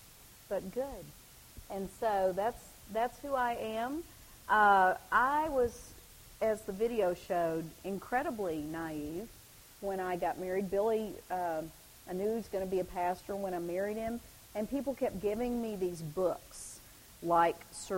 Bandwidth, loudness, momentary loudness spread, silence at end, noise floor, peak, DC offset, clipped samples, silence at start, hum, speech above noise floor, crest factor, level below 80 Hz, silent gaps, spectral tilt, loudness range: 16 kHz; -34 LUFS; 21 LU; 0 s; -56 dBFS; -14 dBFS; under 0.1%; under 0.1%; 0 s; none; 23 dB; 20 dB; -58 dBFS; none; -5 dB/octave; 6 LU